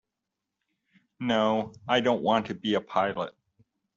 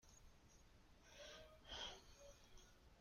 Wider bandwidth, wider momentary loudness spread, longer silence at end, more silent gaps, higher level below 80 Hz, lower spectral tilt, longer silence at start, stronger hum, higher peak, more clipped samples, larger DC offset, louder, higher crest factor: second, 7.6 kHz vs 16 kHz; second, 9 LU vs 16 LU; first, 0.65 s vs 0 s; neither; about the same, -68 dBFS vs -70 dBFS; about the same, -3 dB/octave vs -2 dB/octave; first, 1.2 s vs 0 s; neither; first, -8 dBFS vs -40 dBFS; neither; neither; first, -27 LUFS vs -58 LUFS; about the same, 20 dB vs 20 dB